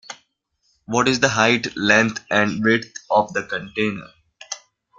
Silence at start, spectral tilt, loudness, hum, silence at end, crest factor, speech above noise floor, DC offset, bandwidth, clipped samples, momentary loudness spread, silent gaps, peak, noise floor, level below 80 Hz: 0.1 s; -4 dB/octave; -19 LUFS; none; 0.4 s; 20 dB; 49 dB; under 0.1%; 9.2 kHz; under 0.1%; 17 LU; none; -2 dBFS; -68 dBFS; -58 dBFS